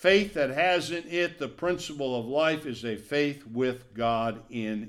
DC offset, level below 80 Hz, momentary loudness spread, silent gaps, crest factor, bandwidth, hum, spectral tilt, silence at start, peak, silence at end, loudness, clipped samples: under 0.1%; -58 dBFS; 8 LU; none; 18 dB; 15 kHz; none; -5 dB/octave; 0 s; -8 dBFS; 0 s; -28 LUFS; under 0.1%